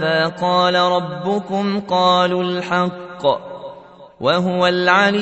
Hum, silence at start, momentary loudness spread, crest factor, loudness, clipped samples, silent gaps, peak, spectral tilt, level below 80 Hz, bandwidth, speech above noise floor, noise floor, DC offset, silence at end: none; 0 s; 9 LU; 16 dB; -17 LUFS; under 0.1%; none; 0 dBFS; -5.5 dB/octave; -60 dBFS; 8.4 kHz; 23 dB; -40 dBFS; under 0.1%; 0 s